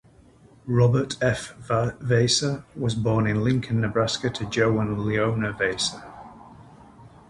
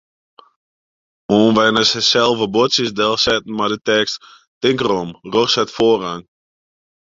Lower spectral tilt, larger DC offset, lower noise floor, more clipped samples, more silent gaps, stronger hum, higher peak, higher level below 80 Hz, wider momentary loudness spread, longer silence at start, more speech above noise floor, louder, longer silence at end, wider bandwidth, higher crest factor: first, -5 dB/octave vs -3.5 dB/octave; neither; second, -53 dBFS vs under -90 dBFS; neither; second, none vs 4.47-4.61 s; neither; second, -8 dBFS vs -2 dBFS; about the same, -50 dBFS vs -52 dBFS; about the same, 8 LU vs 8 LU; second, 0.65 s vs 1.3 s; second, 30 dB vs over 74 dB; second, -24 LUFS vs -16 LUFS; second, 0.2 s vs 0.85 s; first, 11.5 kHz vs 7.8 kHz; about the same, 16 dB vs 16 dB